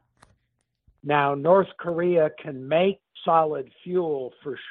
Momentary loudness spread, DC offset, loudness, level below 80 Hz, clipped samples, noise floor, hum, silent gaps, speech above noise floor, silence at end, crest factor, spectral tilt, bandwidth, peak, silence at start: 14 LU; under 0.1%; -24 LUFS; -68 dBFS; under 0.1%; -75 dBFS; none; none; 52 dB; 0 s; 18 dB; -5 dB/octave; 4.2 kHz; -6 dBFS; 1.05 s